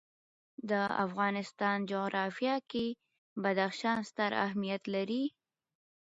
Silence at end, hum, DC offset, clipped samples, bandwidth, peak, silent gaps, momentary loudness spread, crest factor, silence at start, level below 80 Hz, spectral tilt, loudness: 0.75 s; none; under 0.1%; under 0.1%; 7.6 kHz; -16 dBFS; 3.18-3.36 s; 5 LU; 20 dB; 0.6 s; -76 dBFS; -3.5 dB/octave; -34 LUFS